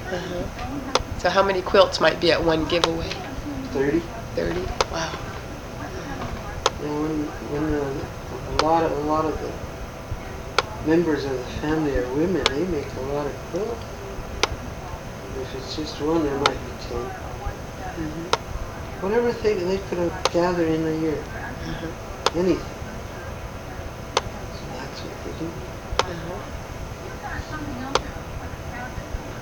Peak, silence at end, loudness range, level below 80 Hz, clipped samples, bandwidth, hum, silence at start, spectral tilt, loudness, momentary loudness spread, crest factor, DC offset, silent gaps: 0 dBFS; 0 s; 9 LU; -38 dBFS; under 0.1%; 19 kHz; none; 0 s; -5 dB/octave; -26 LUFS; 13 LU; 26 dB; under 0.1%; none